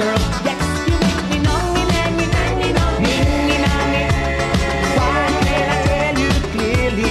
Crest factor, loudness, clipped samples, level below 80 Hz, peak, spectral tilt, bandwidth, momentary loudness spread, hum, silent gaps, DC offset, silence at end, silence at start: 14 dB; -17 LUFS; under 0.1%; -24 dBFS; -2 dBFS; -5 dB/octave; 14 kHz; 2 LU; none; none; under 0.1%; 0 s; 0 s